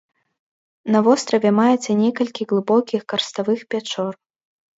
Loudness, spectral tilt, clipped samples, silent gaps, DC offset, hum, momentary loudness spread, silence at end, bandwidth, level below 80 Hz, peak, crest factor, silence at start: -19 LUFS; -5 dB/octave; under 0.1%; none; under 0.1%; none; 10 LU; 0.65 s; 8 kHz; -70 dBFS; -2 dBFS; 18 dB; 0.85 s